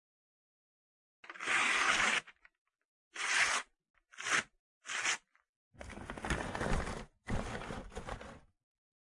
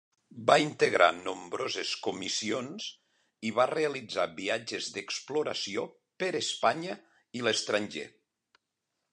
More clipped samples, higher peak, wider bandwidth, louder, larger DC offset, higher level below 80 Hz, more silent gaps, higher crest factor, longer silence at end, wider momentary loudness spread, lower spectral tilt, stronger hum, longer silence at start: neither; second, -16 dBFS vs -6 dBFS; about the same, 11.5 kHz vs 11 kHz; second, -34 LUFS vs -30 LUFS; neither; first, -50 dBFS vs -76 dBFS; first, 2.58-2.65 s, 2.85-3.11 s, 3.90-3.94 s, 4.59-4.81 s, 5.49-5.71 s vs none; about the same, 24 dB vs 24 dB; second, 0.65 s vs 1.05 s; first, 22 LU vs 14 LU; about the same, -2 dB/octave vs -3 dB/octave; neither; first, 1.25 s vs 0.35 s